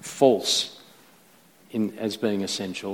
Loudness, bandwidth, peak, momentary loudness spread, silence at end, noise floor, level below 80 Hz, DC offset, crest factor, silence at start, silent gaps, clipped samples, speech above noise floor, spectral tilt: -25 LUFS; 17.5 kHz; -4 dBFS; 10 LU; 0 s; -56 dBFS; -72 dBFS; under 0.1%; 22 dB; 0 s; none; under 0.1%; 32 dB; -3.5 dB/octave